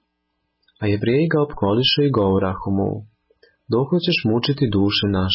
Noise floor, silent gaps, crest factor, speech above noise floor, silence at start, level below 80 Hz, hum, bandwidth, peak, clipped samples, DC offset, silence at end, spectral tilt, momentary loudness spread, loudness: -73 dBFS; none; 14 dB; 55 dB; 0.8 s; -42 dBFS; none; 5.8 kHz; -6 dBFS; under 0.1%; under 0.1%; 0 s; -10.5 dB/octave; 7 LU; -19 LUFS